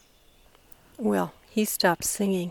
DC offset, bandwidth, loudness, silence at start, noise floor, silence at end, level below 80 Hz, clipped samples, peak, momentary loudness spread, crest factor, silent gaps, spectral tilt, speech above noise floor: under 0.1%; 19 kHz; -26 LUFS; 1 s; -58 dBFS; 0 s; -60 dBFS; under 0.1%; -6 dBFS; 6 LU; 22 dB; none; -4 dB/octave; 32 dB